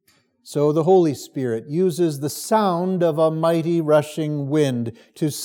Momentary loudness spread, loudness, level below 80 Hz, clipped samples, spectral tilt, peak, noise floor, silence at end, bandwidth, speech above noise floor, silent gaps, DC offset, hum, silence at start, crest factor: 10 LU; -20 LUFS; -78 dBFS; under 0.1%; -6.5 dB/octave; -6 dBFS; -51 dBFS; 0 s; 18 kHz; 31 dB; none; under 0.1%; none; 0.45 s; 16 dB